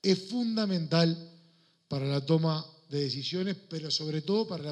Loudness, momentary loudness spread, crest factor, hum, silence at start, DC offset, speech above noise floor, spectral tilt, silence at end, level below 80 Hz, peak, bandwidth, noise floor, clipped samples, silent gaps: -30 LUFS; 9 LU; 18 dB; none; 0.05 s; under 0.1%; 35 dB; -6 dB/octave; 0 s; -76 dBFS; -12 dBFS; 9.2 kHz; -64 dBFS; under 0.1%; none